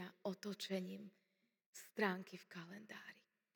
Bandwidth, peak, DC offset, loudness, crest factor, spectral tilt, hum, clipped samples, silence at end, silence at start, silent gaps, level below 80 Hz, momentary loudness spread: over 20 kHz; -22 dBFS; under 0.1%; -47 LUFS; 26 dB; -5 dB/octave; none; under 0.1%; 0.35 s; 0 s; 1.66-1.73 s; under -90 dBFS; 18 LU